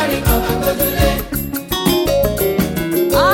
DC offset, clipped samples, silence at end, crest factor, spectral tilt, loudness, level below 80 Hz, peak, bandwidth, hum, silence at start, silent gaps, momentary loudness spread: under 0.1%; under 0.1%; 0 s; 14 dB; -5 dB/octave; -16 LUFS; -26 dBFS; -2 dBFS; 17 kHz; none; 0 s; none; 6 LU